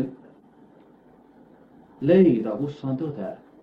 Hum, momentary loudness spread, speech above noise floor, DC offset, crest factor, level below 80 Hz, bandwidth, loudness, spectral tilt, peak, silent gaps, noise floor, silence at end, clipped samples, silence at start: none; 16 LU; 32 dB; under 0.1%; 20 dB; -64 dBFS; 5.4 kHz; -23 LUFS; -10 dB/octave; -6 dBFS; none; -54 dBFS; 0.25 s; under 0.1%; 0 s